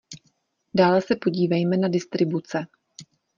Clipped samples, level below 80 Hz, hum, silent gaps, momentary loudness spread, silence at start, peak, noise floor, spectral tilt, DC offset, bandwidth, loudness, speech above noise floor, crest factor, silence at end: under 0.1%; -64 dBFS; none; none; 17 LU; 0.1 s; -6 dBFS; -68 dBFS; -7 dB/octave; under 0.1%; 7.4 kHz; -23 LUFS; 46 dB; 18 dB; 0.35 s